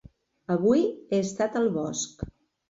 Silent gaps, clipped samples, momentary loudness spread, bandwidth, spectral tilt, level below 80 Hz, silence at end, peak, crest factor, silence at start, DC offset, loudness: none; under 0.1%; 17 LU; 8 kHz; -5.5 dB/octave; -54 dBFS; 0.4 s; -10 dBFS; 16 dB; 0.5 s; under 0.1%; -26 LUFS